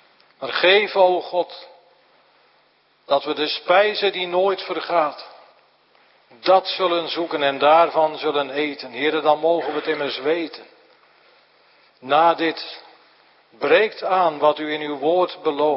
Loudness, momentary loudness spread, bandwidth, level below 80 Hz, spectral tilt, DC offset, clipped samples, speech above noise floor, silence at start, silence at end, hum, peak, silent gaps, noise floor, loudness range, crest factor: -20 LUFS; 11 LU; 5.8 kHz; -78 dBFS; -8 dB/octave; under 0.1%; under 0.1%; 40 dB; 0.4 s; 0 s; none; -2 dBFS; none; -60 dBFS; 4 LU; 20 dB